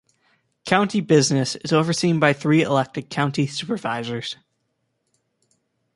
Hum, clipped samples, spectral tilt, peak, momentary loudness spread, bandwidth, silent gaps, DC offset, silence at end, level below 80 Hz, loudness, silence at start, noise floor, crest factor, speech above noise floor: none; under 0.1%; -5 dB/octave; -2 dBFS; 11 LU; 11.5 kHz; none; under 0.1%; 1.6 s; -62 dBFS; -21 LUFS; 0.65 s; -73 dBFS; 20 dB; 53 dB